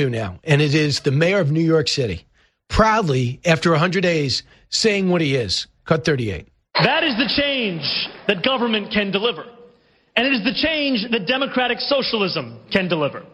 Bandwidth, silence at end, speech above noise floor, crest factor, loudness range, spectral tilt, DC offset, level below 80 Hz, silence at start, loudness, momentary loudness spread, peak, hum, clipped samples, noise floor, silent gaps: 11.5 kHz; 0.1 s; 35 dB; 18 dB; 2 LU; -5 dB/octave; under 0.1%; -42 dBFS; 0 s; -19 LUFS; 7 LU; 0 dBFS; none; under 0.1%; -55 dBFS; none